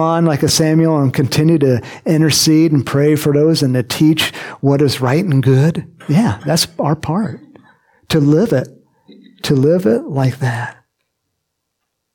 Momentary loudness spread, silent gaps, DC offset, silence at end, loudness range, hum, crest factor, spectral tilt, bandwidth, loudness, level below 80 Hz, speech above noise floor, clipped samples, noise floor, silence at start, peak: 8 LU; none; under 0.1%; 1.45 s; 5 LU; none; 12 dB; -5.5 dB/octave; 17.5 kHz; -14 LUFS; -50 dBFS; 60 dB; under 0.1%; -73 dBFS; 0 s; -2 dBFS